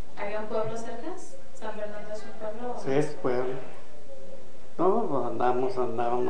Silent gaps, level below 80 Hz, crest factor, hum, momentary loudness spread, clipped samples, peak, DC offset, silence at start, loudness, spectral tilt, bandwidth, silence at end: none; -64 dBFS; 20 dB; none; 21 LU; under 0.1%; -12 dBFS; 6%; 0 s; -31 LUFS; -6.5 dB/octave; 10 kHz; 0 s